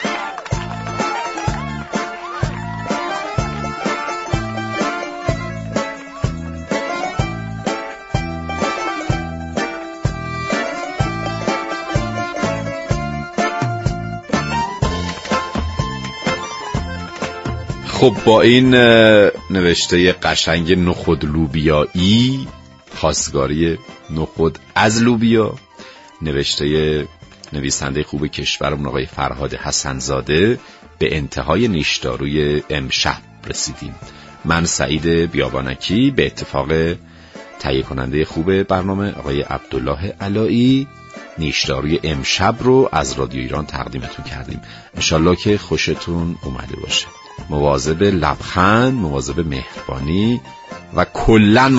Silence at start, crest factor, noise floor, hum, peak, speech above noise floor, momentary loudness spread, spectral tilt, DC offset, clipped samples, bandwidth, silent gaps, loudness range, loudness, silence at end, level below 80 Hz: 0 s; 18 dB; -39 dBFS; none; 0 dBFS; 23 dB; 12 LU; -5 dB/octave; under 0.1%; under 0.1%; 8 kHz; none; 9 LU; -18 LUFS; 0 s; -34 dBFS